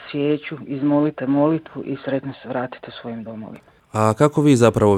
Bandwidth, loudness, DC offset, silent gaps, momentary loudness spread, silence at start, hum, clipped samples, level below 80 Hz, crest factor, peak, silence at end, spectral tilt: 14 kHz; -20 LUFS; under 0.1%; none; 18 LU; 0 s; none; under 0.1%; -52 dBFS; 18 dB; -2 dBFS; 0 s; -7 dB/octave